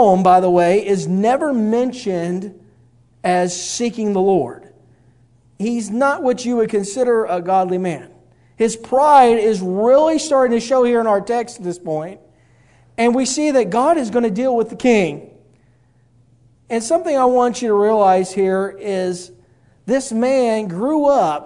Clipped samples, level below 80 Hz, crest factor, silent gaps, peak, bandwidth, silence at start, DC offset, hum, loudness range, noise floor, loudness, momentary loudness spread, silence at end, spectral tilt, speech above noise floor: under 0.1%; -56 dBFS; 16 dB; none; 0 dBFS; 11 kHz; 0 s; under 0.1%; none; 5 LU; -54 dBFS; -17 LUFS; 11 LU; 0 s; -5.5 dB/octave; 39 dB